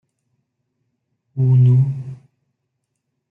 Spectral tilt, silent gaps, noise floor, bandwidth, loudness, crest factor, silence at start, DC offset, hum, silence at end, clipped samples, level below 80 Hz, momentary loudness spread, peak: -12 dB/octave; none; -75 dBFS; 1.1 kHz; -16 LUFS; 14 dB; 1.35 s; under 0.1%; none; 1.15 s; under 0.1%; -62 dBFS; 20 LU; -6 dBFS